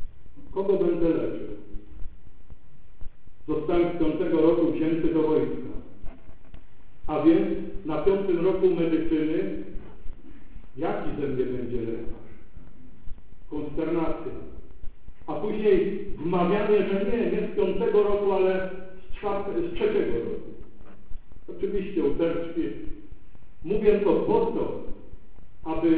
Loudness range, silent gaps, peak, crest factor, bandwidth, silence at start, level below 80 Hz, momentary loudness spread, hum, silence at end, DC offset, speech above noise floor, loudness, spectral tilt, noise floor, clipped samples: 8 LU; none; -6 dBFS; 18 dB; 4 kHz; 0 s; -44 dBFS; 21 LU; none; 0 s; 3%; 23 dB; -26 LUFS; -11 dB/octave; -47 dBFS; under 0.1%